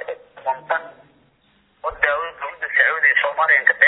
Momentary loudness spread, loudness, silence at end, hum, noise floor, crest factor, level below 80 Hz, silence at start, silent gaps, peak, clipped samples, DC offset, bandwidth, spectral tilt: 15 LU; -18 LUFS; 0 s; none; -60 dBFS; 20 dB; -56 dBFS; 0 s; none; 0 dBFS; under 0.1%; under 0.1%; 4.1 kHz; -4 dB/octave